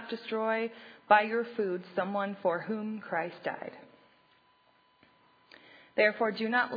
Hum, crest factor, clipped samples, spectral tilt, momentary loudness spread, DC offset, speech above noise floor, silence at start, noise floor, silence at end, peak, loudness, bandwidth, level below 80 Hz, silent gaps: none; 24 dB; under 0.1%; -7.5 dB/octave; 13 LU; under 0.1%; 36 dB; 0 s; -67 dBFS; 0 s; -8 dBFS; -31 LUFS; 5 kHz; -88 dBFS; none